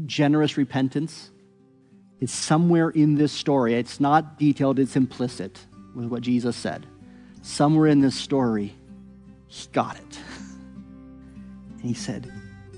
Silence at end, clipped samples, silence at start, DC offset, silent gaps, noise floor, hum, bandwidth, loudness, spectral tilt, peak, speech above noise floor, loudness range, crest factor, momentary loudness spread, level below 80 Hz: 0 s; under 0.1%; 0 s; under 0.1%; none; -56 dBFS; none; 11 kHz; -23 LUFS; -6 dB/octave; -6 dBFS; 33 dB; 12 LU; 18 dB; 23 LU; -58 dBFS